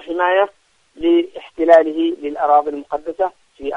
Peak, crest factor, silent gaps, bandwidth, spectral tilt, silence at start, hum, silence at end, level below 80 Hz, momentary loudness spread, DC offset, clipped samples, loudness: 0 dBFS; 18 dB; none; 6.8 kHz; -5 dB/octave; 0.05 s; none; 0 s; -54 dBFS; 13 LU; under 0.1%; under 0.1%; -17 LUFS